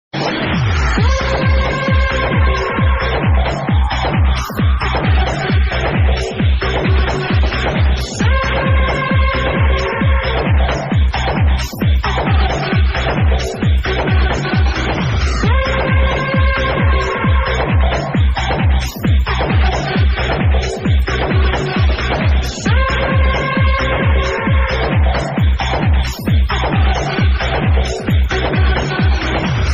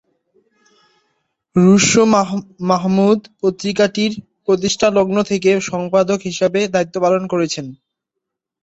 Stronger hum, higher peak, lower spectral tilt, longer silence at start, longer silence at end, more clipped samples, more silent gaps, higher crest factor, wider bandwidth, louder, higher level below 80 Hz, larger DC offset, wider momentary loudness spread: neither; about the same, -2 dBFS vs -2 dBFS; about the same, -6 dB/octave vs -5 dB/octave; second, 0.15 s vs 1.55 s; second, 0 s vs 0.9 s; neither; neither; about the same, 12 dB vs 16 dB; first, 13 kHz vs 8 kHz; about the same, -15 LUFS vs -16 LUFS; first, -16 dBFS vs -54 dBFS; neither; second, 2 LU vs 10 LU